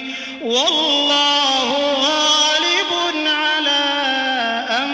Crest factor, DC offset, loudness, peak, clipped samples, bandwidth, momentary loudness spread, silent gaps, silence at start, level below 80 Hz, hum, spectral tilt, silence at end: 14 dB; under 0.1%; -15 LUFS; -4 dBFS; under 0.1%; 8 kHz; 6 LU; none; 0 s; -62 dBFS; none; 0 dB/octave; 0 s